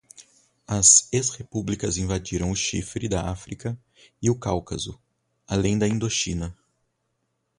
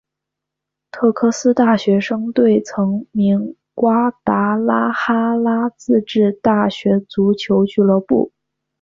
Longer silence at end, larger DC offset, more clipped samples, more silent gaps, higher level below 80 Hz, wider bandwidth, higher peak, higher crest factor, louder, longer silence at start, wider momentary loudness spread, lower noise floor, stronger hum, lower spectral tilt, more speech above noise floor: first, 1.05 s vs 0.55 s; neither; neither; neither; first, -44 dBFS vs -56 dBFS; first, 11.5 kHz vs 7.6 kHz; about the same, -2 dBFS vs -2 dBFS; first, 24 dB vs 14 dB; second, -23 LUFS vs -16 LUFS; second, 0.2 s vs 0.95 s; first, 17 LU vs 5 LU; second, -75 dBFS vs -82 dBFS; neither; second, -3.5 dB/octave vs -6.5 dB/octave; second, 51 dB vs 66 dB